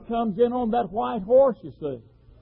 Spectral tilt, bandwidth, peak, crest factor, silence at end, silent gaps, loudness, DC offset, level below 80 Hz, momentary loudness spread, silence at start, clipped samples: -11.5 dB/octave; 4.1 kHz; -10 dBFS; 14 dB; 0.4 s; none; -23 LUFS; under 0.1%; -52 dBFS; 15 LU; 0 s; under 0.1%